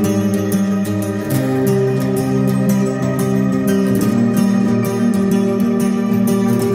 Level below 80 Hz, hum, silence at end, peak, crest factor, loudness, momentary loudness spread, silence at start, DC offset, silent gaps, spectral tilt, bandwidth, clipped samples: -48 dBFS; none; 0 s; -4 dBFS; 12 dB; -16 LUFS; 3 LU; 0 s; under 0.1%; none; -7 dB/octave; 16.5 kHz; under 0.1%